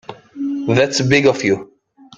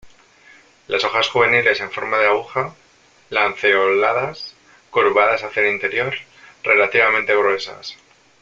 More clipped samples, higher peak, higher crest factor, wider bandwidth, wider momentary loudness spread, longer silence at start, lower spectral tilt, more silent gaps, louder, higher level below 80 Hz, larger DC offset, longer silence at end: neither; about the same, -2 dBFS vs -2 dBFS; about the same, 16 dB vs 18 dB; first, 9.2 kHz vs 7.6 kHz; about the same, 12 LU vs 13 LU; about the same, 0.1 s vs 0.05 s; about the same, -5 dB/octave vs -4 dB/octave; neither; about the same, -16 LUFS vs -17 LUFS; first, -52 dBFS vs -62 dBFS; neither; about the same, 0.55 s vs 0.5 s